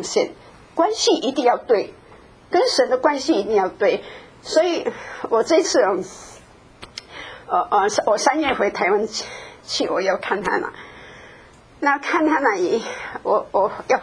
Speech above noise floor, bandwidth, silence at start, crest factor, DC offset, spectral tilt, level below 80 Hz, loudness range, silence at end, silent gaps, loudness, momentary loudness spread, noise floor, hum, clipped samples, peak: 27 dB; 11 kHz; 0 s; 20 dB; under 0.1%; -3 dB/octave; -56 dBFS; 3 LU; 0 s; none; -20 LUFS; 17 LU; -47 dBFS; none; under 0.1%; 0 dBFS